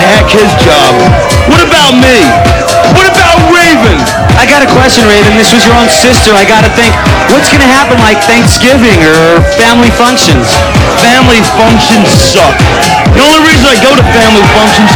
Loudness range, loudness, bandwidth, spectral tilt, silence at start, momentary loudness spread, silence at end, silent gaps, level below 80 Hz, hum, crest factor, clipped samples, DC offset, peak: 1 LU; -3 LUFS; over 20 kHz; -4 dB/octave; 0 s; 3 LU; 0 s; none; -18 dBFS; none; 4 dB; 10%; under 0.1%; 0 dBFS